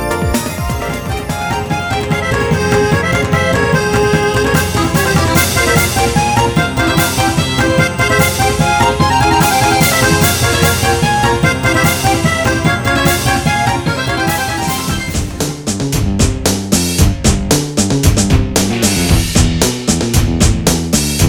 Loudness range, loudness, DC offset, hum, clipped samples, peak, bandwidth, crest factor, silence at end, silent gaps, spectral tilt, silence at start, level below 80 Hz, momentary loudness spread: 4 LU; -13 LUFS; under 0.1%; none; under 0.1%; 0 dBFS; over 20 kHz; 12 dB; 0 s; none; -4 dB/octave; 0 s; -24 dBFS; 6 LU